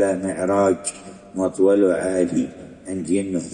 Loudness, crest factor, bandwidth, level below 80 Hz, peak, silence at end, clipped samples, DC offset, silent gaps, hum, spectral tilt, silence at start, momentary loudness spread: -21 LUFS; 16 dB; 10.5 kHz; -58 dBFS; -6 dBFS; 0 s; under 0.1%; under 0.1%; none; none; -6 dB/octave; 0 s; 14 LU